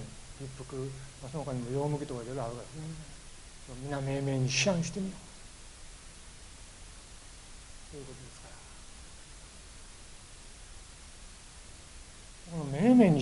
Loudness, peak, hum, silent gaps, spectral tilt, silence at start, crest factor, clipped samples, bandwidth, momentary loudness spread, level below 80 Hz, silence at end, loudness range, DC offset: -32 LUFS; -10 dBFS; none; none; -5.5 dB/octave; 0 s; 24 dB; under 0.1%; 11.5 kHz; 21 LU; -52 dBFS; 0 s; 16 LU; under 0.1%